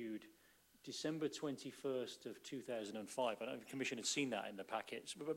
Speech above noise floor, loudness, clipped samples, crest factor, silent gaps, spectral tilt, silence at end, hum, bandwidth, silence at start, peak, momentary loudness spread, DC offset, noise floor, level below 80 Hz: 27 dB; -45 LUFS; under 0.1%; 18 dB; none; -3 dB/octave; 0 s; none; 16 kHz; 0 s; -26 dBFS; 11 LU; under 0.1%; -71 dBFS; -88 dBFS